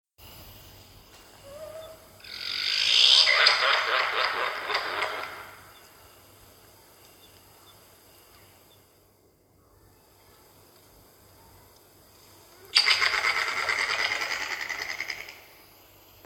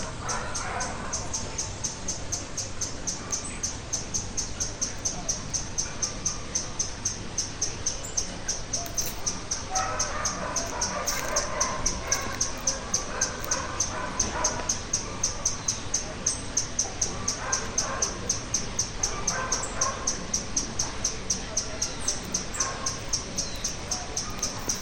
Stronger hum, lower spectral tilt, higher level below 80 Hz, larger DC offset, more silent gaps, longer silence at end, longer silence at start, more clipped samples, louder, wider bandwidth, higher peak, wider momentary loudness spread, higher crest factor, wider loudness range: neither; second, 0.5 dB/octave vs -1.5 dB/octave; second, -64 dBFS vs -42 dBFS; neither; neither; first, 0.85 s vs 0 s; first, 0.2 s vs 0 s; neither; first, -23 LUFS vs -28 LUFS; first, over 20 kHz vs 17.5 kHz; first, -2 dBFS vs -10 dBFS; first, 27 LU vs 5 LU; first, 28 dB vs 20 dB; first, 12 LU vs 3 LU